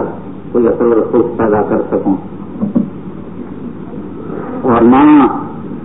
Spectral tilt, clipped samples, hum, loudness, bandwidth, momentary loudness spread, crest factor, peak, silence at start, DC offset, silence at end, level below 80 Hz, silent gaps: -13.5 dB/octave; under 0.1%; none; -12 LUFS; 3.9 kHz; 20 LU; 12 dB; 0 dBFS; 0 s; 2%; 0 s; -42 dBFS; none